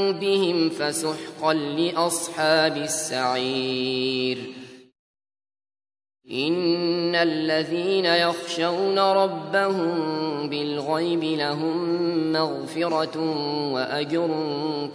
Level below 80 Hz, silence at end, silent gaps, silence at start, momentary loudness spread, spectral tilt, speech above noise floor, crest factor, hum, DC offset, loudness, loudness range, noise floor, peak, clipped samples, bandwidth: -74 dBFS; 0 s; 4.99-5.14 s; 0 s; 7 LU; -4 dB/octave; over 66 dB; 20 dB; none; under 0.1%; -24 LUFS; 5 LU; under -90 dBFS; -4 dBFS; under 0.1%; 11 kHz